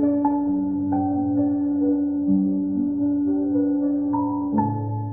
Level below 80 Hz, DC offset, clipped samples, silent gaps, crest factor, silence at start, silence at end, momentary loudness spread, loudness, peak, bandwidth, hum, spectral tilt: -60 dBFS; 0.2%; under 0.1%; none; 12 dB; 0 s; 0 s; 2 LU; -22 LUFS; -10 dBFS; 1.9 kHz; none; -14.5 dB/octave